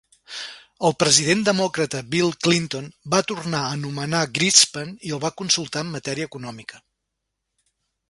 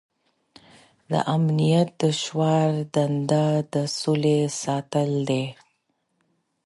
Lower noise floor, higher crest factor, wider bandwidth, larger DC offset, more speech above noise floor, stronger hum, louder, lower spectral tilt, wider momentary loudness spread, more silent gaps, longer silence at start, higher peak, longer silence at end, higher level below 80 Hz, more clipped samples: first, -80 dBFS vs -72 dBFS; first, 24 dB vs 16 dB; about the same, 11.5 kHz vs 11.5 kHz; neither; first, 58 dB vs 50 dB; neither; first, -20 LUFS vs -23 LUFS; second, -3 dB/octave vs -6 dB/octave; first, 18 LU vs 5 LU; neither; second, 0.3 s vs 1.1 s; first, 0 dBFS vs -8 dBFS; first, 1.3 s vs 1.15 s; first, -60 dBFS vs -68 dBFS; neither